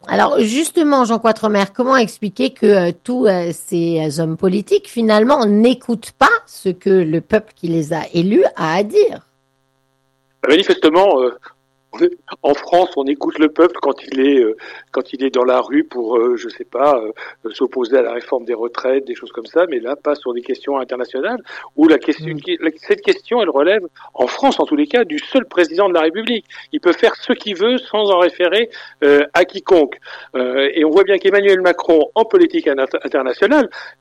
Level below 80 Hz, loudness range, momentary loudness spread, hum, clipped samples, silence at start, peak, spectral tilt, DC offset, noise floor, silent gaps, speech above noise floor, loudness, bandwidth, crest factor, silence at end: -58 dBFS; 4 LU; 9 LU; none; under 0.1%; 0.05 s; -2 dBFS; -5.5 dB/octave; under 0.1%; -63 dBFS; none; 48 dB; -15 LUFS; 12.5 kHz; 14 dB; 0.1 s